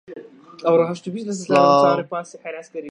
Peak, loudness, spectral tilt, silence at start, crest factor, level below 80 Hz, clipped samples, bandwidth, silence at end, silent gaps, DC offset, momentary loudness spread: -2 dBFS; -19 LUFS; -5.5 dB/octave; 0.1 s; 18 dB; -74 dBFS; under 0.1%; 10 kHz; 0 s; none; under 0.1%; 19 LU